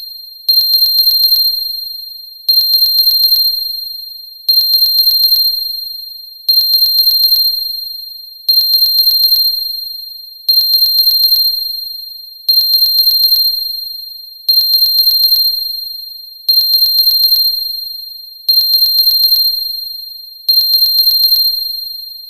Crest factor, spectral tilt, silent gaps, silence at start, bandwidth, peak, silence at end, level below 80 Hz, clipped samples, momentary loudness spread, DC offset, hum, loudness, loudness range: 12 dB; 3.5 dB/octave; none; 0 s; 16 kHz; 0 dBFS; 0 s; -68 dBFS; under 0.1%; 15 LU; 0.6%; none; -8 LUFS; 2 LU